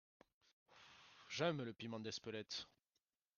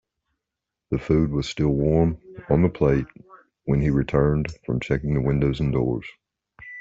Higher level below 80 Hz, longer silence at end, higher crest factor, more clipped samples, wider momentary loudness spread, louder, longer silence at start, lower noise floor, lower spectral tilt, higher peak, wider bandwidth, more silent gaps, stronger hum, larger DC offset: second, -86 dBFS vs -38 dBFS; first, 0.7 s vs 0 s; first, 24 dB vs 18 dB; neither; first, 21 LU vs 11 LU; second, -46 LUFS vs -23 LUFS; second, 0.7 s vs 0.9 s; first, under -90 dBFS vs -85 dBFS; second, -4.5 dB/octave vs -8.5 dB/octave; second, -26 dBFS vs -6 dBFS; first, 10 kHz vs 7.6 kHz; neither; neither; neither